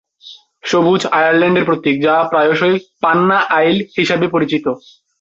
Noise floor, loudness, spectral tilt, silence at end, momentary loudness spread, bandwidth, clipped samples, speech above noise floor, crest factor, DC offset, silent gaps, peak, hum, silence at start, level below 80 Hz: -41 dBFS; -14 LUFS; -5.5 dB/octave; 0.45 s; 5 LU; 8 kHz; under 0.1%; 27 dB; 12 dB; under 0.1%; none; -2 dBFS; none; 0.25 s; -56 dBFS